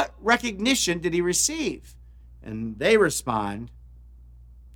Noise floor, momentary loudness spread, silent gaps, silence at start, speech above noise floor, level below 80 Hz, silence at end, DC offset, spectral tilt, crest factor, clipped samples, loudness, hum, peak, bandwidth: -47 dBFS; 17 LU; none; 0 s; 23 dB; -48 dBFS; 0 s; under 0.1%; -3 dB/octave; 22 dB; under 0.1%; -23 LUFS; none; -4 dBFS; 19 kHz